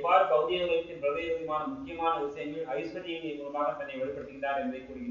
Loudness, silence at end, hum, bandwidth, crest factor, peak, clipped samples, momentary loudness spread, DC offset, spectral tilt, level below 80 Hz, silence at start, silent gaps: -32 LUFS; 0 s; none; 7.2 kHz; 20 dB; -10 dBFS; under 0.1%; 10 LU; under 0.1%; -2.5 dB/octave; -62 dBFS; 0 s; none